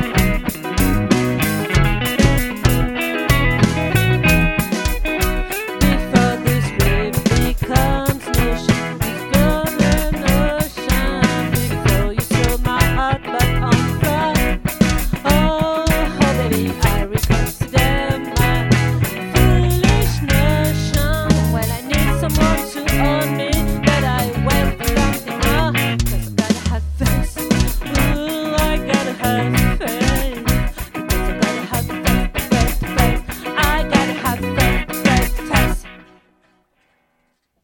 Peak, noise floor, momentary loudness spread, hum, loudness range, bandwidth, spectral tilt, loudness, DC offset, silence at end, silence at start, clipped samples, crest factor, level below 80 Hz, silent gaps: 0 dBFS; -66 dBFS; 5 LU; none; 3 LU; 17.5 kHz; -5 dB/octave; -17 LUFS; under 0.1%; 1.6 s; 0 s; under 0.1%; 16 dB; -22 dBFS; none